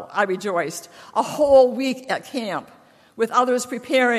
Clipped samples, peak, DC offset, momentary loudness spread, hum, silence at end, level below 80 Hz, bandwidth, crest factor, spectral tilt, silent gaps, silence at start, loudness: under 0.1%; -4 dBFS; under 0.1%; 13 LU; none; 0 s; -58 dBFS; 14 kHz; 18 dB; -3.5 dB/octave; none; 0 s; -21 LUFS